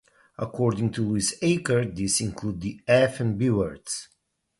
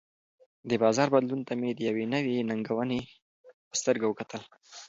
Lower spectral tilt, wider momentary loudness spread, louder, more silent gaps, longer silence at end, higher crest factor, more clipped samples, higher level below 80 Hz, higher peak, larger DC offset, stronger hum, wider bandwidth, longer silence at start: about the same, -5 dB/octave vs -5 dB/octave; second, 12 LU vs 16 LU; first, -25 LUFS vs -29 LUFS; second, none vs 3.22-3.44 s, 3.54-3.71 s; first, 0.55 s vs 0 s; about the same, 18 dB vs 20 dB; neither; first, -52 dBFS vs -70 dBFS; about the same, -8 dBFS vs -10 dBFS; neither; neither; first, 12 kHz vs 7.8 kHz; second, 0.4 s vs 0.65 s